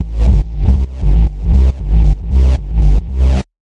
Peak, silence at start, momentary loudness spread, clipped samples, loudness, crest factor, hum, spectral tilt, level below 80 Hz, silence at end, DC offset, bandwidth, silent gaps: 0 dBFS; 0 s; 2 LU; under 0.1%; -14 LUFS; 10 dB; none; -8.5 dB/octave; -12 dBFS; 0.3 s; under 0.1%; 6 kHz; none